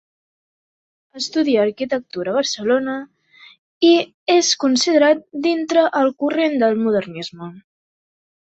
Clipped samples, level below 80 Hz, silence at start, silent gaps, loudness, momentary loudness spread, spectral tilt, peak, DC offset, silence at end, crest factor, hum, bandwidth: under 0.1%; -66 dBFS; 1.15 s; 3.58-3.81 s, 4.14-4.26 s; -18 LUFS; 13 LU; -3 dB/octave; -2 dBFS; under 0.1%; 0.9 s; 18 dB; none; 8.2 kHz